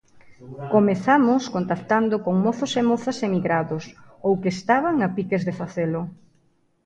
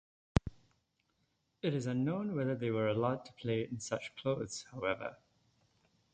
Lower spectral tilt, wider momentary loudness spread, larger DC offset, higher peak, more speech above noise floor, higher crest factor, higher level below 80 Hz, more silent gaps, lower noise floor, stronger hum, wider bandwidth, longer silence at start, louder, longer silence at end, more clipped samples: about the same, -6.5 dB/octave vs -6 dB/octave; first, 12 LU vs 7 LU; neither; first, -4 dBFS vs -12 dBFS; about the same, 42 dB vs 43 dB; second, 18 dB vs 26 dB; second, -62 dBFS vs -54 dBFS; neither; second, -63 dBFS vs -79 dBFS; neither; about the same, 9 kHz vs 9 kHz; about the same, 0.3 s vs 0.35 s; first, -22 LUFS vs -37 LUFS; second, 0.7 s vs 1 s; neither